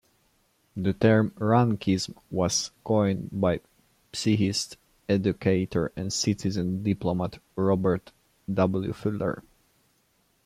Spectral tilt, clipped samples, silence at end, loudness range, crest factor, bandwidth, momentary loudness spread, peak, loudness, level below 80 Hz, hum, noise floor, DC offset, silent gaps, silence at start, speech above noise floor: -5.5 dB/octave; under 0.1%; 1.05 s; 3 LU; 18 dB; 14.5 kHz; 9 LU; -8 dBFS; -26 LUFS; -56 dBFS; none; -68 dBFS; under 0.1%; none; 0.75 s; 43 dB